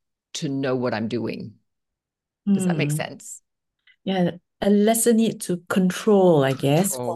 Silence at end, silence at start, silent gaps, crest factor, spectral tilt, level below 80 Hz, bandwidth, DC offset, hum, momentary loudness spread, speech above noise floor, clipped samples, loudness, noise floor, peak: 0 s; 0.35 s; none; 16 dB; -5.5 dB/octave; -60 dBFS; 12.5 kHz; under 0.1%; none; 17 LU; 66 dB; under 0.1%; -22 LUFS; -86 dBFS; -6 dBFS